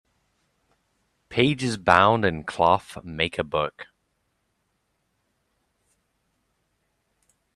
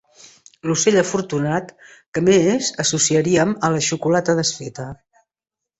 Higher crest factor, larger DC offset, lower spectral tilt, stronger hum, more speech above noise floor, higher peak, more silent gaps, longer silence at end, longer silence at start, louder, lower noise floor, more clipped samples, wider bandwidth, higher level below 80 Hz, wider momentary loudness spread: first, 26 dB vs 16 dB; neither; first, -5.5 dB/octave vs -4 dB/octave; neither; second, 51 dB vs 67 dB; about the same, 0 dBFS vs -2 dBFS; second, none vs 2.08-2.12 s; first, 3.7 s vs 0.85 s; first, 1.3 s vs 0.65 s; second, -22 LUFS vs -18 LUFS; second, -74 dBFS vs -86 dBFS; neither; first, 13 kHz vs 8.4 kHz; about the same, -56 dBFS vs -56 dBFS; second, 11 LU vs 14 LU